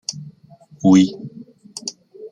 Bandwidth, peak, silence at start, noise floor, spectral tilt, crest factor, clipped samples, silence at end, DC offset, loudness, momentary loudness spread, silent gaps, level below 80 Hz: 10.5 kHz; -2 dBFS; 0.1 s; -48 dBFS; -5.5 dB/octave; 18 dB; under 0.1%; 0.05 s; under 0.1%; -16 LUFS; 23 LU; none; -62 dBFS